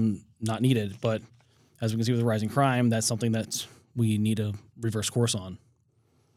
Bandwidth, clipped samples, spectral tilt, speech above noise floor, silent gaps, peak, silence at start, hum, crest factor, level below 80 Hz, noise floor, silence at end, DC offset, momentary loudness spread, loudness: 15.5 kHz; under 0.1%; -5.5 dB/octave; 40 dB; none; -10 dBFS; 0 s; none; 18 dB; -68 dBFS; -67 dBFS; 0.8 s; under 0.1%; 10 LU; -28 LUFS